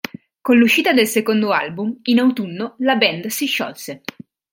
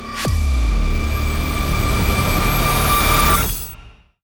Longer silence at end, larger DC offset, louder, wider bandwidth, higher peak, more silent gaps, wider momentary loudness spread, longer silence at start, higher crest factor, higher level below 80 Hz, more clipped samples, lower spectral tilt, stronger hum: first, 0.55 s vs 0.35 s; neither; about the same, -17 LUFS vs -18 LUFS; second, 17 kHz vs over 20 kHz; about the same, -2 dBFS vs -4 dBFS; neither; first, 17 LU vs 7 LU; first, 0.45 s vs 0 s; about the same, 16 dB vs 14 dB; second, -66 dBFS vs -20 dBFS; neither; about the same, -4 dB/octave vs -4 dB/octave; neither